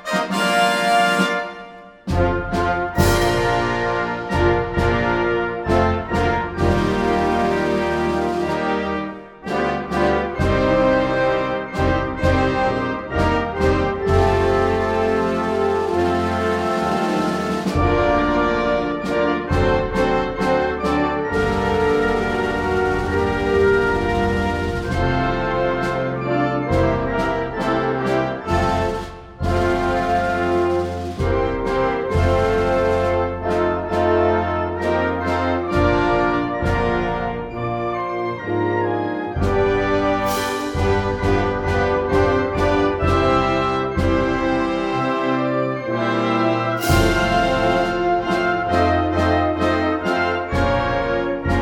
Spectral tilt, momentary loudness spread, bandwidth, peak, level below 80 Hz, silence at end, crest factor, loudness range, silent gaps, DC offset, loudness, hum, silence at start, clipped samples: -6.5 dB/octave; 5 LU; 16 kHz; -4 dBFS; -32 dBFS; 0 s; 16 dB; 2 LU; none; under 0.1%; -19 LUFS; none; 0 s; under 0.1%